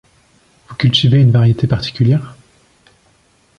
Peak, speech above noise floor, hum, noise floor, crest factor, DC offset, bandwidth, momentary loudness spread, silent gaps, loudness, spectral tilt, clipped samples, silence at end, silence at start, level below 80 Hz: 0 dBFS; 42 dB; none; -54 dBFS; 14 dB; under 0.1%; 7 kHz; 11 LU; none; -13 LUFS; -7 dB/octave; under 0.1%; 1.3 s; 0.7 s; -42 dBFS